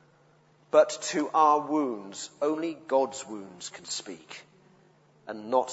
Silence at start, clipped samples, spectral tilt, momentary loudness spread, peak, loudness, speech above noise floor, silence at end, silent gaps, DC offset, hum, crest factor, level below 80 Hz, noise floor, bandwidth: 0.75 s; under 0.1%; -3.5 dB/octave; 20 LU; -8 dBFS; -27 LUFS; 34 dB; 0 s; none; under 0.1%; none; 22 dB; -80 dBFS; -62 dBFS; 8 kHz